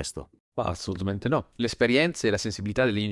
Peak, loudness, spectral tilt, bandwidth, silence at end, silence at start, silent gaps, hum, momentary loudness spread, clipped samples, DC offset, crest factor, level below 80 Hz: -8 dBFS; -26 LUFS; -5 dB/octave; 12 kHz; 0 s; 0 s; 0.40-0.52 s; none; 11 LU; under 0.1%; under 0.1%; 20 dB; -52 dBFS